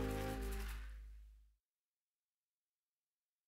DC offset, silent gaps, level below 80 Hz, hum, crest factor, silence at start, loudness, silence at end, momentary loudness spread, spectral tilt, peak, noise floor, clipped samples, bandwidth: under 0.1%; none; -52 dBFS; none; 20 dB; 0 s; -47 LUFS; 2 s; 19 LU; -5.5 dB/octave; -30 dBFS; under -90 dBFS; under 0.1%; 16 kHz